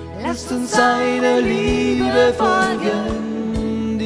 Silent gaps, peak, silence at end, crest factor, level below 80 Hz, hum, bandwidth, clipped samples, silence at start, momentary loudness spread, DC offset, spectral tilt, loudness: none; 0 dBFS; 0 s; 18 dB; -38 dBFS; none; 11 kHz; under 0.1%; 0 s; 8 LU; under 0.1%; -5 dB/octave; -18 LUFS